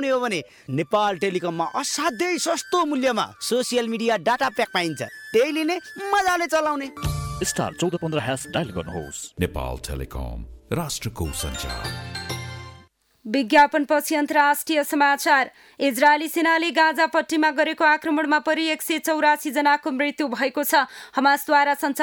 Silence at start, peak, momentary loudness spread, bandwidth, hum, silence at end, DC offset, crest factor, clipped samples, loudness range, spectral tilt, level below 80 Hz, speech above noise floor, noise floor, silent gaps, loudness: 0 s; -4 dBFS; 12 LU; over 20 kHz; none; 0 s; under 0.1%; 18 dB; under 0.1%; 10 LU; -4 dB/octave; -44 dBFS; 30 dB; -52 dBFS; none; -22 LUFS